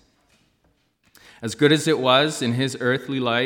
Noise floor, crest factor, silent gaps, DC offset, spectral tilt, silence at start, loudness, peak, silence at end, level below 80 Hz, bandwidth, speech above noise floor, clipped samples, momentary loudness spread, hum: -65 dBFS; 20 dB; none; under 0.1%; -4.5 dB/octave; 1.4 s; -20 LUFS; -2 dBFS; 0 s; -68 dBFS; 17.5 kHz; 45 dB; under 0.1%; 7 LU; none